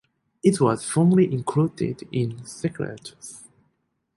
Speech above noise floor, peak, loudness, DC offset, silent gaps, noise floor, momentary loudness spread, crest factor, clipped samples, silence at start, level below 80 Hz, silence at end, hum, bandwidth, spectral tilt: 49 dB; -4 dBFS; -23 LUFS; under 0.1%; none; -72 dBFS; 19 LU; 20 dB; under 0.1%; 0.45 s; -60 dBFS; 0.75 s; none; 11.5 kHz; -7 dB/octave